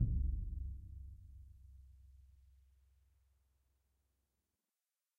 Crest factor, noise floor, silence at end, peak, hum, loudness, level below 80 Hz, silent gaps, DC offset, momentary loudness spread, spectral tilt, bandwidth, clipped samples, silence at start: 22 dB; under -90 dBFS; 2.95 s; -22 dBFS; none; -45 LUFS; -48 dBFS; none; under 0.1%; 24 LU; -11 dB/octave; 0.7 kHz; under 0.1%; 0 s